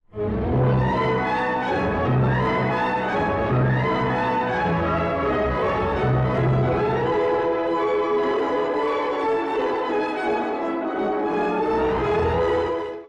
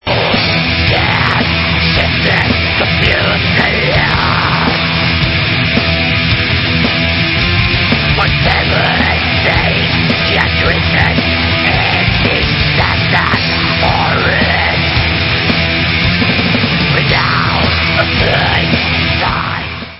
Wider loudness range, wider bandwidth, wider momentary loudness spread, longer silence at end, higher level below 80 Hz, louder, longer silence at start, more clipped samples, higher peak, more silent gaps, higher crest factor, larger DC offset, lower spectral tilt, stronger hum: about the same, 2 LU vs 0 LU; about the same, 7.4 kHz vs 8 kHz; about the same, 3 LU vs 1 LU; about the same, 0 s vs 0 s; second, -40 dBFS vs -24 dBFS; second, -22 LUFS vs -11 LUFS; about the same, 0.15 s vs 0.05 s; neither; second, -12 dBFS vs 0 dBFS; neither; about the same, 8 dB vs 12 dB; neither; about the same, -8 dB/octave vs -7 dB/octave; neither